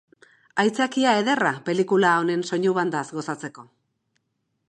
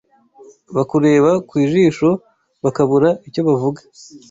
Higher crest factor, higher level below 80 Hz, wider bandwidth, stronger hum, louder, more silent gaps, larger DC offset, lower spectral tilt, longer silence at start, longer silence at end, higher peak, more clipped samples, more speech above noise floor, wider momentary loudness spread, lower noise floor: about the same, 18 dB vs 14 dB; second, -76 dBFS vs -56 dBFS; first, 11 kHz vs 8 kHz; neither; second, -22 LUFS vs -16 LUFS; neither; neither; second, -5 dB/octave vs -7.5 dB/octave; second, 0.55 s vs 0.7 s; first, 1.05 s vs 0.15 s; second, -6 dBFS vs -2 dBFS; neither; first, 53 dB vs 30 dB; about the same, 11 LU vs 10 LU; first, -75 dBFS vs -46 dBFS